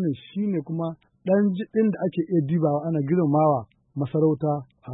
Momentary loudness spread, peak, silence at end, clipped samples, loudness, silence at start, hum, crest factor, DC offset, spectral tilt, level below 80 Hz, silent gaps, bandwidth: 9 LU; -10 dBFS; 0 s; under 0.1%; -24 LUFS; 0 s; none; 14 dB; under 0.1%; -13 dB/octave; -66 dBFS; none; 4 kHz